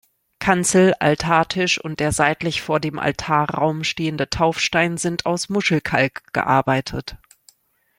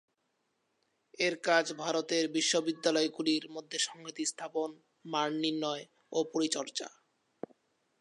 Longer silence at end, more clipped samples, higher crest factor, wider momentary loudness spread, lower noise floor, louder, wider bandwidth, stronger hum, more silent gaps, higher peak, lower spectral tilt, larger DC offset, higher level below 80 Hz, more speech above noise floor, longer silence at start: second, 0.85 s vs 1.1 s; neither; about the same, 18 dB vs 22 dB; second, 7 LU vs 12 LU; second, -56 dBFS vs -79 dBFS; first, -19 LUFS vs -32 LUFS; first, 16.5 kHz vs 11.5 kHz; neither; neither; first, -2 dBFS vs -12 dBFS; first, -4.5 dB/octave vs -2.5 dB/octave; neither; first, -48 dBFS vs -88 dBFS; second, 37 dB vs 47 dB; second, 0.4 s vs 1.2 s